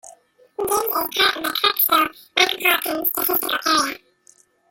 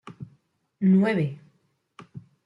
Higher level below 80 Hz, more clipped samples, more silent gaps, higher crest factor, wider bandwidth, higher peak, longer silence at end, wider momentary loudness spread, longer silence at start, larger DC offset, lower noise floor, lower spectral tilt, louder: first, -60 dBFS vs -70 dBFS; neither; neither; about the same, 20 dB vs 16 dB; first, 17 kHz vs 5.2 kHz; first, -2 dBFS vs -12 dBFS; first, 0.75 s vs 0.25 s; second, 7 LU vs 25 LU; about the same, 0.05 s vs 0.05 s; neither; second, -56 dBFS vs -68 dBFS; second, -0.5 dB/octave vs -9.5 dB/octave; first, -19 LUFS vs -23 LUFS